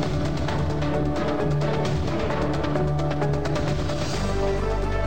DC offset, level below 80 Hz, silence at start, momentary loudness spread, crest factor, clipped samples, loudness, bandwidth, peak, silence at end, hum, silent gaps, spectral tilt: 3%; -32 dBFS; 0 s; 2 LU; 10 dB; under 0.1%; -25 LUFS; 15.5 kHz; -12 dBFS; 0 s; none; none; -6.5 dB/octave